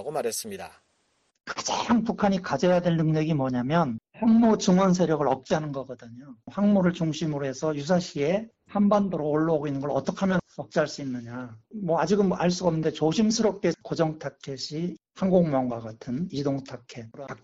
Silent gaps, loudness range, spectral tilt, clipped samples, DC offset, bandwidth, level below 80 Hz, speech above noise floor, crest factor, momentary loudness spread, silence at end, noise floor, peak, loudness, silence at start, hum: none; 4 LU; -6 dB/octave; under 0.1%; under 0.1%; 10 kHz; -58 dBFS; 45 dB; 18 dB; 15 LU; 0.05 s; -71 dBFS; -8 dBFS; -26 LUFS; 0 s; none